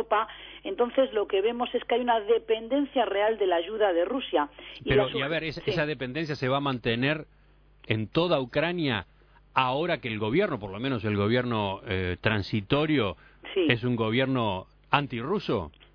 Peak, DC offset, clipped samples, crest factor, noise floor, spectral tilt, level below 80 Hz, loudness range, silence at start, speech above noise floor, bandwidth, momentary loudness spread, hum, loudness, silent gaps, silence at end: -4 dBFS; under 0.1%; under 0.1%; 22 dB; -57 dBFS; -8 dB/octave; -54 dBFS; 2 LU; 0 s; 30 dB; 5.4 kHz; 6 LU; none; -27 LUFS; none; 0.25 s